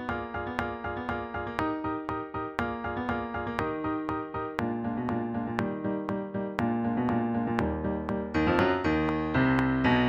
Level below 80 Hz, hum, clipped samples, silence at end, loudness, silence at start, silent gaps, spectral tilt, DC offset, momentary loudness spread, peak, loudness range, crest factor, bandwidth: -46 dBFS; none; under 0.1%; 0 s; -30 LUFS; 0 s; none; -8 dB/octave; under 0.1%; 8 LU; -6 dBFS; 5 LU; 22 dB; 8.4 kHz